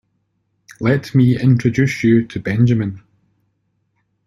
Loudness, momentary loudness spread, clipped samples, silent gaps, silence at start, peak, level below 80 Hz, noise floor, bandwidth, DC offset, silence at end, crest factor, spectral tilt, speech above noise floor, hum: -16 LUFS; 8 LU; under 0.1%; none; 0.8 s; -2 dBFS; -50 dBFS; -67 dBFS; 11.5 kHz; under 0.1%; 1.3 s; 16 dB; -8 dB/octave; 53 dB; none